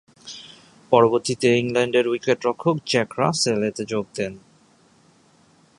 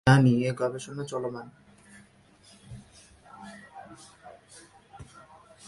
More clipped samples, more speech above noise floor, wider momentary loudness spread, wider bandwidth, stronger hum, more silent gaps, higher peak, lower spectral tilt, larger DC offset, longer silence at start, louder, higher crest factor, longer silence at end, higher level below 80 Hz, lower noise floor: neither; about the same, 36 dB vs 33 dB; second, 13 LU vs 27 LU; about the same, 11.5 kHz vs 11.5 kHz; neither; neither; first, -2 dBFS vs -6 dBFS; second, -4.5 dB/octave vs -7 dB/octave; neither; first, 0.25 s vs 0.05 s; first, -21 LUFS vs -27 LUFS; about the same, 22 dB vs 24 dB; first, 1.4 s vs 0.65 s; second, -62 dBFS vs -56 dBFS; about the same, -56 dBFS vs -58 dBFS